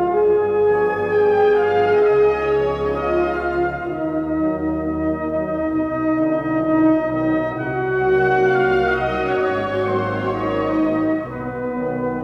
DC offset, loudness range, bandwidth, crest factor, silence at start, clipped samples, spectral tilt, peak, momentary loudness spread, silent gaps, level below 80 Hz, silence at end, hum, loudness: under 0.1%; 4 LU; 6.2 kHz; 12 dB; 0 s; under 0.1%; -8.5 dB/octave; -6 dBFS; 7 LU; none; -42 dBFS; 0 s; none; -19 LUFS